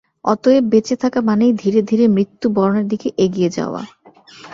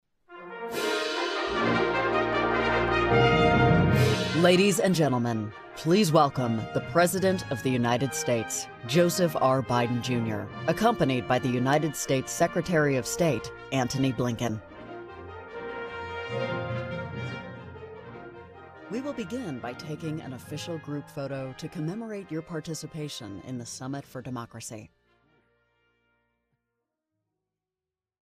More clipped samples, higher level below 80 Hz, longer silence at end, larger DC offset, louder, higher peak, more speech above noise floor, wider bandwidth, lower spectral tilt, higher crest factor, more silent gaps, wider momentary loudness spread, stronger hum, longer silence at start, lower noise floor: neither; second, -56 dBFS vs -50 dBFS; second, 0 s vs 3.45 s; neither; first, -16 LUFS vs -27 LUFS; first, -2 dBFS vs -8 dBFS; second, 27 dB vs over 63 dB; second, 7.6 kHz vs 15.5 kHz; first, -7 dB/octave vs -5 dB/octave; second, 14 dB vs 20 dB; neither; second, 8 LU vs 17 LU; neither; about the same, 0.25 s vs 0.3 s; second, -42 dBFS vs under -90 dBFS